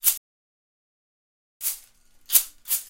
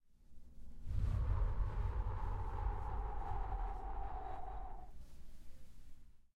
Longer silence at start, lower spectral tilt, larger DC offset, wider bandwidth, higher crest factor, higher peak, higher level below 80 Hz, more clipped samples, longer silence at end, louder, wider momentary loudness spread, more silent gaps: second, 0.05 s vs 0.2 s; second, 4 dB/octave vs -8 dB/octave; neither; first, 17 kHz vs 5 kHz; first, 28 dB vs 16 dB; first, -2 dBFS vs -26 dBFS; second, -64 dBFS vs -42 dBFS; neither; about the same, 0.05 s vs 0.1 s; first, -23 LUFS vs -44 LUFS; second, 12 LU vs 23 LU; first, 0.17-1.60 s vs none